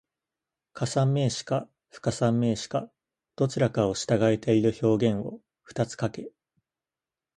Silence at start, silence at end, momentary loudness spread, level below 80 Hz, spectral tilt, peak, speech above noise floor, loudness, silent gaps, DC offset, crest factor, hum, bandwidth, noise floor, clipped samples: 0.75 s; 1.1 s; 13 LU; -60 dBFS; -6.5 dB/octave; -8 dBFS; over 64 dB; -27 LUFS; none; under 0.1%; 20 dB; none; 11.5 kHz; under -90 dBFS; under 0.1%